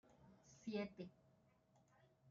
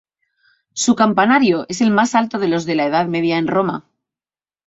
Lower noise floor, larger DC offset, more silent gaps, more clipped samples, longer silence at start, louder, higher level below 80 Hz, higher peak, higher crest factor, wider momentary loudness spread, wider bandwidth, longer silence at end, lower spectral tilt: second, -76 dBFS vs under -90 dBFS; neither; neither; neither; second, 0.05 s vs 0.75 s; second, -51 LUFS vs -16 LUFS; second, -84 dBFS vs -60 dBFS; second, -34 dBFS vs -2 dBFS; about the same, 20 dB vs 16 dB; first, 20 LU vs 7 LU; about the same, 7.4 kHz vs 8 kHz; second, 0 s vs 0.85 s; about the same, -5.5 dB/octave vs -4.5 dB/octave